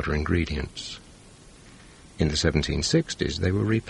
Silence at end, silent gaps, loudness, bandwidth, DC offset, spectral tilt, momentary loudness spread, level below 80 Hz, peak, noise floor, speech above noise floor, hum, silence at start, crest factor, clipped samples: 0 s; none; -26 LUFS; 11.5 kHz; under 0.1%; -5 dB/octave; 12 LU; -38 dBFS; -6 dBFS; -49 dBFS; 24 dB; none; 0 s; 20 dB; under 0.1%